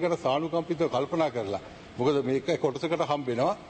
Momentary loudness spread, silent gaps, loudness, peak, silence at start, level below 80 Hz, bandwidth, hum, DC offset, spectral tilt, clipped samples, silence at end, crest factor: 6 LU; none; -28 LUFS; -12 dBFS; 0 s; -62 dBFS; 8.8 kHz; none; under 0.1%; -6 dB/octave; under 0.1%; 0 s; 16 dB